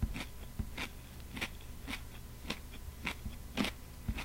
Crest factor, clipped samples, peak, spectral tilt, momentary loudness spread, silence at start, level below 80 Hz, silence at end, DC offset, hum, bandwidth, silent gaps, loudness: 24 dB; under 0.1%; -18 dBFS; -4.5 dB/octave; 11 LU; 0 s; -46 dBFS; 0 s; under 0.1%; none; 16 kHz; none; -43 LUFS